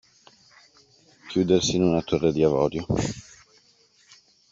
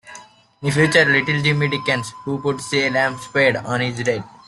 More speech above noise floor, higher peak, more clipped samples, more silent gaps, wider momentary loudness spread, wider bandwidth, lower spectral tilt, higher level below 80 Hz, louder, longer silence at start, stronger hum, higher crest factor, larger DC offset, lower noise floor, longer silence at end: first, 38 dB vs 24 dB; second, -6 dBFS vs -2 dBFS; neither; neither; about the same, 8 LU vs 9 LU; second, 7.8 kHz vs 12 kHz; about the same, -5.5 dB/octave vs -5 dB/octave; first, -50 dBFS vs -56 dBFS; second, -23 LUFS vs -18 LUFS; first, 1.25 s vs 0.05 s; neither; about the same, 20 dB vs 18 dB; neither; first, -60 dBFS vs -43 dBFS; first, 1.3 s vs 0.1 s